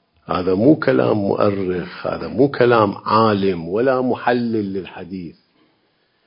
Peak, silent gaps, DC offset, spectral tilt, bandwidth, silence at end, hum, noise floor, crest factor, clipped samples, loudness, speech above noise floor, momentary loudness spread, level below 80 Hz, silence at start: 0 dBFS; none; under 0.1%; -11.5 dB/octave; 5.4 kHz; 0.95 s; none; -63 dBFS; 18 dB; under 0.1%; -18 LUFS; 46 dB; 14 LU; -50 dBFS; 0.3 s